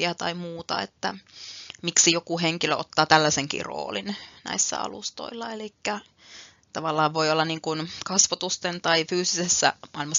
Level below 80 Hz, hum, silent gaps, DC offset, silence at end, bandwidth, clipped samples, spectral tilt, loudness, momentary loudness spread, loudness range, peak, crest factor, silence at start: -66 dBFS; none; none; under 0.1%; 0 s; 7.6 kHz; under 0.1%; -2 dB/octave; -24 LUFS; 15 LU; 6 LU; -2 dBFS; 26 dB; 0 s